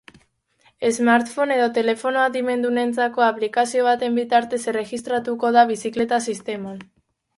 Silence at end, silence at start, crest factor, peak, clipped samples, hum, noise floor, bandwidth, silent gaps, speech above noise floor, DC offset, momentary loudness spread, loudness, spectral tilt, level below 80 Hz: 0.55 s; 0.8 s; 18 dB; -2 dBFS; under 0.1%; none; -61 dBFS; 11.5 kHz; none; 41 dB; under 0.1%; 9 LU; -20 LUFS; -3.5 dB/octave; -66 dBFS